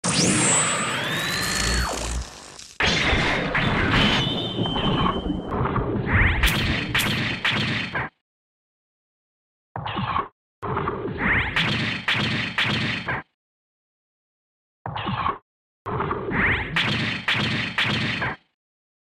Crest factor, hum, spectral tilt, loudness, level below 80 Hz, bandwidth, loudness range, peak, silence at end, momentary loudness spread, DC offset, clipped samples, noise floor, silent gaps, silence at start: 18 dB; none; -3.5 dB/octave; -22 LUFS; -36 dBFS; 16 kHz; 8 LU; -6 dBFS; 0.65 s; 12 LU; under 0.1%; under 0.1%; under -90 dBFS; 8.21-9.75 s, 10.32-10.62 s, 13.34-14.85 s, 15.42-15.85 s; 0.05 s